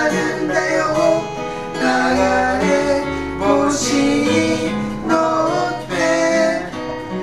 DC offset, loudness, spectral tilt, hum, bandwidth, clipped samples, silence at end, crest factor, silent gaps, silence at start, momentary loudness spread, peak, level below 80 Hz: under 0.1%; -17 LUFS; -4.5 dB/octave; none; 14 kHz; under 0.1%; 0 s; 16 dB; none; 0 s; 8 LU; -2 dBFS; -40 dBFS